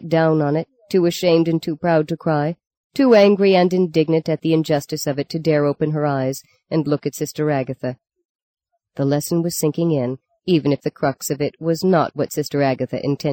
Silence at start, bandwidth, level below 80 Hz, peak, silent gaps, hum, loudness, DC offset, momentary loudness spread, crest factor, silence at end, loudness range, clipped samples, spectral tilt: 0 s; 17 kHz; -60 dBFS; -2 dBFS; 2.77-2.90 s, 8.25-8.54 s; none; -19 LUFS; under 0.1%; 10 LU; 16 dB; 0 s; 6 LU; under 0.1%; -6 dB/octave